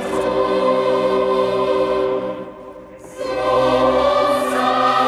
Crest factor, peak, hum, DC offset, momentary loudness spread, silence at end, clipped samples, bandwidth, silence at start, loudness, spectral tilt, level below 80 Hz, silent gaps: 12 dB; -4 dBFS; none; under 0.1%; 17 LU; 0 s; under 0.1%; 14 kHz; 0 s; -17 LUFS; -5 dB/octave; -46 dBFS; none